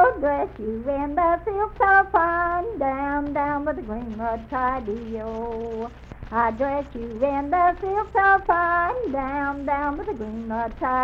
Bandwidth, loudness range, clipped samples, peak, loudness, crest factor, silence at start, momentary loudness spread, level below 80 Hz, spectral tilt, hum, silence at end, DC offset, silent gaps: 7 kHz; 5 LU; under 0.1%; -6 dBFS; -23 LUFS; 18 dB; 0 s; 12 LU; -42 dBFS; -8 dB/octave; none; 0 s; under 0.1%; none